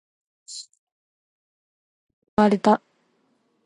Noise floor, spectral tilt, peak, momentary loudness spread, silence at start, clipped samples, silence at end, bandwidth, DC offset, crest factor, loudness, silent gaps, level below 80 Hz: -68 dBFS; -6 dB/octave; -4 dBFS; 20 LU; 0.5 s; under 0.1%; 0.9 s; 11 kHz; under 0.1%; 22 dB; -21 LUFS; 0.79-2.07 s, 2.13-2.22 s, 2.28-2.37 s; -62 dBFS